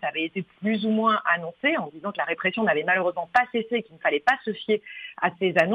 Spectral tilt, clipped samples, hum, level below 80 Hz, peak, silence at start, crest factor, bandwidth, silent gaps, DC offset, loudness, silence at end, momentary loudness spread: -6.5 dB/octave; under 0.1%; none; -70 dBFS; -6 dBFS; 0 s; 18 dB; 8.2 kHz; none; under 0.1%; -25 LUFS; 0 s; 7 LU